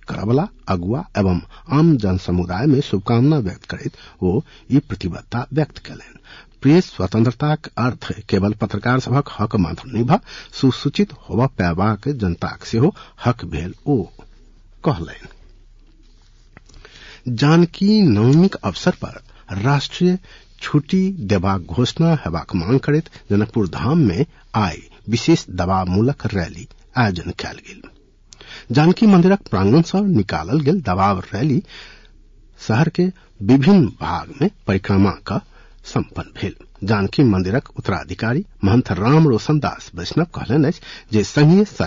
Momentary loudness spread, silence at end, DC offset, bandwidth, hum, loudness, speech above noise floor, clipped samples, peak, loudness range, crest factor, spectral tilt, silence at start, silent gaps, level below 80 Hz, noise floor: 13 LU; 0 s; under 0.1%; 7.6 kHz; none; -18 LUFS; 30 dB; under 0.1%; -4 dBFS; 5 LU; 14 dB; -7.5 dB/octave; 0.1 s; none; -44 dBFS; -48 dBFS